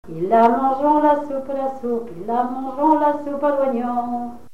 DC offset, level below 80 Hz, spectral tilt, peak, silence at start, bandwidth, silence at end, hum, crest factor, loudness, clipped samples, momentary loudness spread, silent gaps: 1%; -58 dBFS; -7.5 dB/octave; -4 dBFS; 0.05 s; 12.5 kHz; 0.15 s; none; 16 dB; -20 LUFS; under 0.1%; 10 LU; none